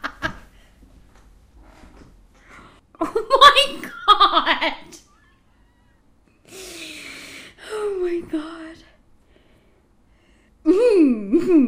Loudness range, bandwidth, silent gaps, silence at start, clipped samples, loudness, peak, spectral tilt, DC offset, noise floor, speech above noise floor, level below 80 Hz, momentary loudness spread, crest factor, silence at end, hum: 15 LU; 15.5 kHz; none; 0.05 s; under 0.1%; -17 LUFS; 0 dBFS; -3 dB/octave; under 0.1%; -57 dBFS; 41 dB; -48 dBFS; 26 LU; 22 dB; 0 s; none